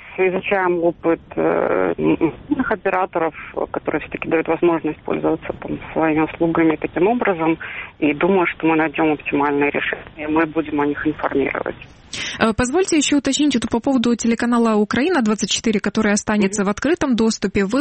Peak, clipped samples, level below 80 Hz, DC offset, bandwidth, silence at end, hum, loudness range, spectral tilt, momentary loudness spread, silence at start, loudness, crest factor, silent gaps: -2 dBFS; under 0.1%; -46 dBFS; under 0.1%; 8.8 kHz; 0 s; none; 3 LU; -4.5 dB/octave; 7 LU; 0 s; -19 LUFS; 18 dB; none